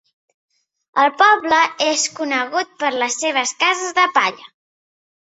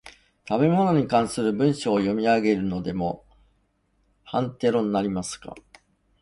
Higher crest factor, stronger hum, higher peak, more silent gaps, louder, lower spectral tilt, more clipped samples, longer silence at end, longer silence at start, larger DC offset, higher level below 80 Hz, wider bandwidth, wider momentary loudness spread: about the same, 18 dB vs 18 dB; neither; first, -2 dBFS vs -8 dBFS; neither; first, -17 LUFS vs -24 LUFS; second, 0 dB/octave vs -6.5 dB/octave; neither; about the same, 0.75 s vs 0.65 s; first, 0.95 s vs 0.05 s; neither; second, -68 dBFS vs -54 dBFS; second, 8.2 kHz vs 11.5 kHz; about the same, 8 LU vs 10 LU